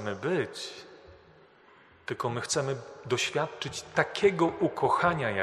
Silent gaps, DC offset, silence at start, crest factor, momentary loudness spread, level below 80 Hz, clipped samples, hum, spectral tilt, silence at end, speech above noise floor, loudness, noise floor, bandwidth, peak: none; under 0.1%; 0 s; 22 dB; 14 LU; -64 dBFS; under 0.1%; none; -4 dB/octave; 0 s; 29 dB; -29 LUFS; -58 dBFS; 13 kHz; -8 dBFS